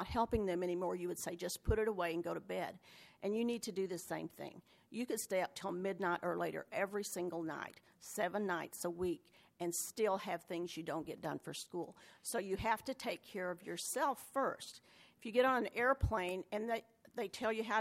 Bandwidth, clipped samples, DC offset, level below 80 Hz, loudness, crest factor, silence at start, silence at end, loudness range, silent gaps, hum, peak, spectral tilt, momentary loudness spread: 16 kHz; under 0.1%; under 0.1%; -58 dBFS; -40 LUFS; 20 dB; 0 s; 0 s; 4 LU; none; none; -20 dBFS; -4.5 dB/octave; 11 LU